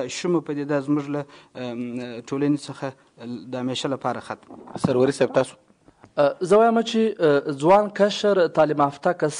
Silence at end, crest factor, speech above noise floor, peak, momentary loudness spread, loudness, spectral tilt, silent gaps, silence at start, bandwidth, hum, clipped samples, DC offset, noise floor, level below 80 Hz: 0 s; 16 dB; 31 dB; -6 dBFS; 16 LU; -22 LUFS; -5.5 dB/octave; none; 0 s; 10.5 kHz; none; under 0.1%; under 0.1%; -53 dBFS; -64 dBFS